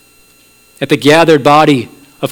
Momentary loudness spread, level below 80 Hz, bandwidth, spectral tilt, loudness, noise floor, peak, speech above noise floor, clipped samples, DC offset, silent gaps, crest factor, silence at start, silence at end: 16 LU; -50 dBFS; 18.5 kHz; -5.5 dB/octave; -8 LUFS; -46 dBFS; 0 dBFS; 38 dB; 1%; under 0.1%; none; 10 dB; 0.8 s; 0 s